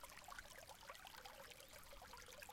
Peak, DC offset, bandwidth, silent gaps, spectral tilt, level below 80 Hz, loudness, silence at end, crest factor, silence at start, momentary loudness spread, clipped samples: -38 dBFS; under 0.1%; 16.5 kHz; none; -1.5 dB/octave; -70 dBFS; -58 LUFS; 0 s; 22 dB; 0 s; 2 LU; under 0.1%